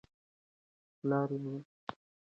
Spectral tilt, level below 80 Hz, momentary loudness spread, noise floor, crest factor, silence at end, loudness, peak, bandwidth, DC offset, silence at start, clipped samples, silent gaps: -9.5 dB/octave; -80 dBFS; 14 LU; under -90 dBFS; 20 dB; 0.4 s; -37 LUFS; -20 dBFS; 6.2 kHz; under 0.1%; 1.05 s; under 0.1%; 1.65-1.87 s